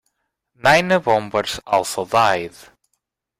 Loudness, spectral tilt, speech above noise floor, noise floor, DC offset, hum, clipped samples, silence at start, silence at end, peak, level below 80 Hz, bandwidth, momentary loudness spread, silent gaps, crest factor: -18 LUFS; -3.5 dB/octave; 56 dB; -74 dBFS; under 0.1%; none; under 0.1%; 0.65 s; 0.9 s; -2 dBFS; -54 dBFS; 16.5 kHz; 8 LU; none; 18 dB